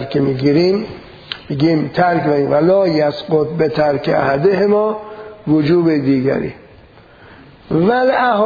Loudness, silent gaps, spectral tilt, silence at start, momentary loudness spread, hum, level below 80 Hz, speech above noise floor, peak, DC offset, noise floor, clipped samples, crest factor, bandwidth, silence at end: -15 LUFS; none; -8.5 dB/octave; 0 s; 13 LU; none; -48 dBFS; 29 dB; 0 dBFS; under 0.1%; -43 dBFS; under 0.1%; 14 dB; 5 kHz; 0 s